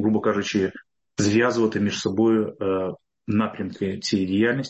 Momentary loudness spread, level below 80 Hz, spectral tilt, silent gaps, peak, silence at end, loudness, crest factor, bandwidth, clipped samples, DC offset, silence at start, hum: 9 LU; -52 dBFS; -5.5 dB/octave; none; -8 dBFS; 0 s; -23 LUFS; 16 dB; 8.4 kHz; under 0.1%; under 0.1%; 0 s; none